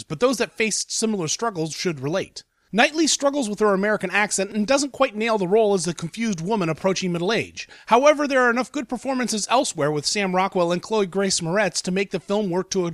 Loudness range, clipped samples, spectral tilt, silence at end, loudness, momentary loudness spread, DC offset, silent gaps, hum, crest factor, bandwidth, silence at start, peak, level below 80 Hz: 2 LU; under 0.1%; -3.5 dB/octave; 0 s; -22 LUFS; 8 LU; under 0.1%; none; none; 18 dB; 14.5 kHz; 0 s; -4 dBFS; -60 dBFS